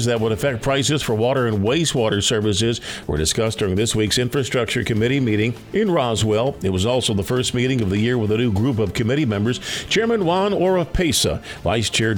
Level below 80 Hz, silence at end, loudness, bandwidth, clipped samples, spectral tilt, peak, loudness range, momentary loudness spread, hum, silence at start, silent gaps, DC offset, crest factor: -38 dBFS; 0 s; -20 LUFS; 20 kHz; under 0.1%; -4.5 dB/octave; -6 dBFS; 1 LU; 3 LU; none; 0 s; none; under 0.1%; 14 dB